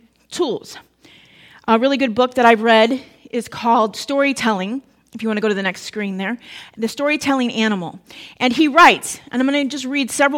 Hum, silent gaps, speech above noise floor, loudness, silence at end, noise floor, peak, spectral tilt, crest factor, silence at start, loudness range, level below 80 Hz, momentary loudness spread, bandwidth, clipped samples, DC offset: none; none; 31 dB; -17 LUFS; 0 s; -48 dBFS; 0 dBFS; -4 dB/octave; 18 dB; 0.3 s; 5 LU; -60 dBFS; 16 LU; 17 kHz; under 0.1%; under 0.1%